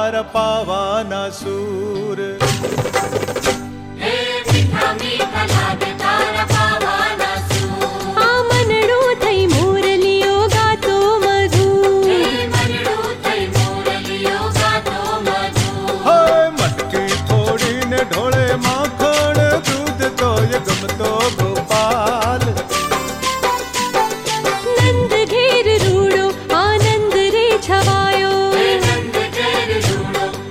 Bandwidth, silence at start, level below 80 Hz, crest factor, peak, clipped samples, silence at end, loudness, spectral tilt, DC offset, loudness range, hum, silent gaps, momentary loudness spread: 16.5 kHz; 0 s; -40 dBFS; 12 dB; -2 dBFS; under 0.1%; 0 s; -16 LUFS; -4.5 dB/octave; under 0.1%; 4 LU; none; none; 6 LU